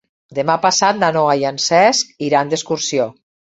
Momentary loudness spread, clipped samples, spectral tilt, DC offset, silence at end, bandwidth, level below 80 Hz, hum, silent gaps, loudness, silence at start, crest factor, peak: 8 LU; under 0.1%; -3 dB/octave; under 0.1%; 0.35 s; 8.2 kHz; -60 dBFS; none; none; -16 LUFS; 0.3 s; 16 dB; 0 dBFS